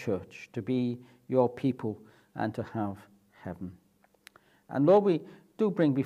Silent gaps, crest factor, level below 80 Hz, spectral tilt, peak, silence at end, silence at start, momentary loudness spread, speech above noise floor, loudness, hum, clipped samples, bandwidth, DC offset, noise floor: none; 20 dB; -74 dBFS; -8.5 dB/octave; -10 dBFS; 0 s; 0 s; 21 LU; 31 dB; -29 LUFS; none; under 0.1%; 12.5 kHz; under 0.1%; -60 dBFS